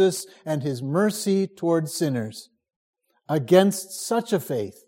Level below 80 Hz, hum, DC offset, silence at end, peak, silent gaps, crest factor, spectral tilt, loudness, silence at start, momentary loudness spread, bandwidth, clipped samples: -72 dBFS; none; under 0.1%; 0.15 s; -4 dBFS; 2.76-2.93 s; 20 dB; -5.5 dB/octave; -24 LUFS; 0 s; 12 LU; 16.5 kHz; under 0.1%